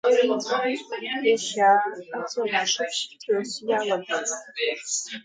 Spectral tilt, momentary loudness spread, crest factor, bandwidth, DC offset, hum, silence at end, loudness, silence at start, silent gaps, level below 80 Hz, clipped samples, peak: -1.5 dB/octave; 10 LU; 16 dB; 9.6 kHz; under 0.1%; none; 0.05 s; -25 LUFS; 0.05 s; none; -80 dBFS; under 0.1%; -8 dBFS